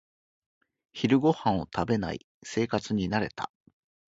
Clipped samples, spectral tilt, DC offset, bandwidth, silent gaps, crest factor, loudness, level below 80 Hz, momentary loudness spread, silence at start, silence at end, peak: under 0.1%; -6.5 dB/octave; under 0.1%; 8 kHz; 2.24-2.41 s; 20 dB; -28 LUFS; -54 dBFS; 15 LU; 0.95 s; 0.7 s; -10 dBFS